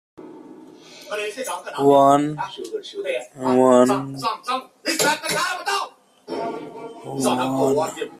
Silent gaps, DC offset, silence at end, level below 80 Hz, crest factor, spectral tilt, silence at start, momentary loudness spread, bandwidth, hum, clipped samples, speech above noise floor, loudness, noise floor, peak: none; under 0.1%; 0.05 s; -64 dBFS; 20 dB; -4 dB/octave; 0.2 s; 18 LU; 15.5 kHz; none; under 0.1%; 23 dB; -21 LUFS; -43 dBFS; -2 dBFS